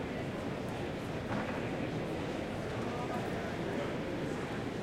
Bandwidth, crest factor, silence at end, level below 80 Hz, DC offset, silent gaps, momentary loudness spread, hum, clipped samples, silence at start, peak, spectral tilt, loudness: 16.5 kHz; 14 dB; 0 s; -56 dBFS; under 0.1%; none; 2 LU; none; under 0.1%; 0 s; -24 dBFS; -6.5 dB/octave; -38 LUFS